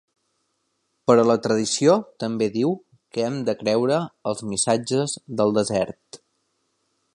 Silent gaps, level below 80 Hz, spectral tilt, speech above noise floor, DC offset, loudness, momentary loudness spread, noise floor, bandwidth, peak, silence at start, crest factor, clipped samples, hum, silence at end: none; -62 dBFS; -4.5 dB/octave; 51 dB; under 0.1%; -22 LUFS; 11 LU; -73 dBFS; 11.5 kHz; -4 dBFS; 1.1 s; 20 dB; under 0.1%; none; 1 s